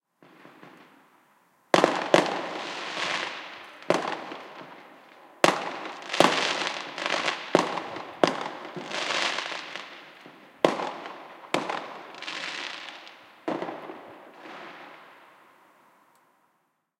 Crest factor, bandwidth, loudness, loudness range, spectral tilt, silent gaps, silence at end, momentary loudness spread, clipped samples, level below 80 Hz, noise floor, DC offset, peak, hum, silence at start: 30 dB; 16.5 kHz; -28 LUFS; 12 LU; -3 dB/octave; none; 1.75 s; 22 LU; under 0.1%; -76 dBFS; -73 dBFS; under 0.1%; 0 dBFS; none; 0.25 s